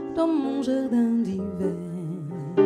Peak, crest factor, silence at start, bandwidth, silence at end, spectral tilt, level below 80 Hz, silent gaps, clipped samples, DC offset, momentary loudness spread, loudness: -8 dBFS; 16 dB; 0 s; 10.5 kHz; 0 s; -8 dB/octave; -60 dBFS; none; under 0.1%; under 0.1%; 10 LU; -26 LUFS